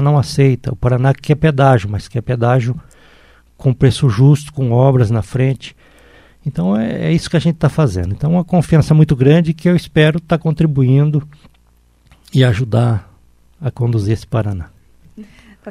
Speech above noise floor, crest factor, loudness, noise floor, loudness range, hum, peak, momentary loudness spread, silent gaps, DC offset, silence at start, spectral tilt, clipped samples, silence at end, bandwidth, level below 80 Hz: 39 dB; 14 dB; -14 LUFS; -52 dBFS; 5 LU; none; 0 dBFS; 10 LU; none; under 0.1%; 0 s; -8 dB/octave; under 0.1%; 0 s; 12 kHz; -38 dBFS